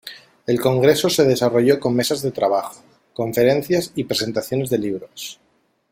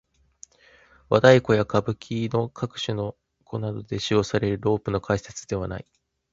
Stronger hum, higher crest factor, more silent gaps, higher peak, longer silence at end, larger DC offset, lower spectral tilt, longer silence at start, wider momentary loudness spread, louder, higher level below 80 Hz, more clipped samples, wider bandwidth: neither; about the same, 18 dB vs 22 dB; neither; about the same, -2 dBFS vs -2 dBFS; about the same, 0.6 s vs 0.5 s; neither; about the same, -5 dB/octave vs -6 dB/octave; second, 0.05 s vs 1.1 s; first, 17 LU vs 14 LU; first, -19 LUFS vs -24 LUFS; second, -58 dBFS vs -50 dBFS; neither; first, 16.5 kHz vs 7.8 kHz